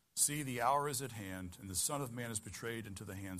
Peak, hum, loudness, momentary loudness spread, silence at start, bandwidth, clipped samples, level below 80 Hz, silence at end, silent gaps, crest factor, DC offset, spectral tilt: -18 dBFS; none; -38 LUFS; 13 LU; 0.15 s; 15.5 kHz; under 0.1%; -68 dBFS; 0 s; none; 20 dB; under 0.1%; -3 dB/octave